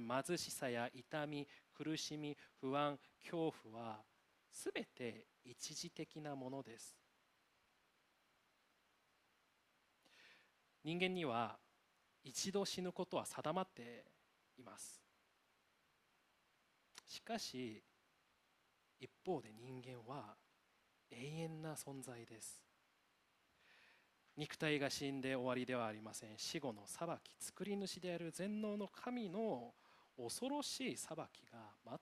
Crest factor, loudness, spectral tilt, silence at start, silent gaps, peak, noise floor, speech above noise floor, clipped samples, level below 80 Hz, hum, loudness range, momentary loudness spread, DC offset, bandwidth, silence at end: 26 dB; -46 LUFS; -4 dB/octave; 0 s; none; -24 dBFS; -79 dBFS; 33 dB; under 0.1%; -86 dBFS; none; 10 LU; 18 LU; under 0.1%; 15 kHz; 0.05 s